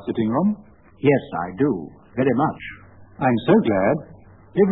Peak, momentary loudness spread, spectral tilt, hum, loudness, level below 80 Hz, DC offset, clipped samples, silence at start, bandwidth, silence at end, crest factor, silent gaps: -4 dBFS; 13 LU; -12 dB/octave; none; -21 LUFS; -54 dBFS; 0.1%; under 0.1%; 0 s; 4.1 kHz; 0 s; 18 dB; none